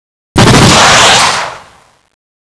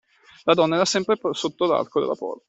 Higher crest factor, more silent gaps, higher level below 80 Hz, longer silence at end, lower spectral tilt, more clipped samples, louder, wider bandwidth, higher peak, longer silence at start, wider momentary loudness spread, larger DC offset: second, 8 dB vs 20 dB; neither; first, -26 dBFS vs -66 dBFS; first, 0.85 s vs 0.15 s; about the same, -3 dB/octave vs -4 dB/octave; first, 1% vs under 0.1%; first, -5 LUFS vs -22 LUFS; first, 11 kHz vs 8.4 kHz; first, 0 dBFS vs -4 dBFS; about the same, 0.35 s vs 0.45 s; first, 12 LU vs 8 LU; neither